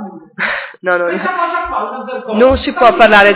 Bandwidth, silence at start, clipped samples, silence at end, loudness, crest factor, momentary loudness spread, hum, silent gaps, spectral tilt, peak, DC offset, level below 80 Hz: 4 kHz; 0 s; 0.5%; 0 s; -13 LUFS; 12 dB; 13 LU; none; none; -8.5 dB/octave; 0 dBFS; under 0.1%; -36 dBFS